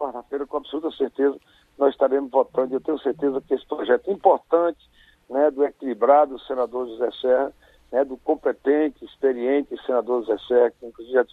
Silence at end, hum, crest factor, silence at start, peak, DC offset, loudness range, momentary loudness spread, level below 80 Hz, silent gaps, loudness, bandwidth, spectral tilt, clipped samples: 0.1 s; none; 20 dB; 0 s; -2 dBFS; under 0.1%; 2 LU; 8 LU; -62 dBFS; none; -23 LUFS; 4.5 kHz; -7 dB/octave; under 0.1%